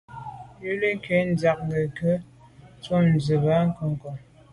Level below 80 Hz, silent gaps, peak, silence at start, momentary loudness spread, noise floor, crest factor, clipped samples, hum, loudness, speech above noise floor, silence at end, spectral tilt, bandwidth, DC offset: -54 dBFS; none; -10 dBFS; 0.1 s; 18 LU; -50 dBFS; 16 dB; under 0.1%; none; -24 LUFS; 27 dB; 0.3 s; -8 dB/octave; 11 kHz; under 0.1%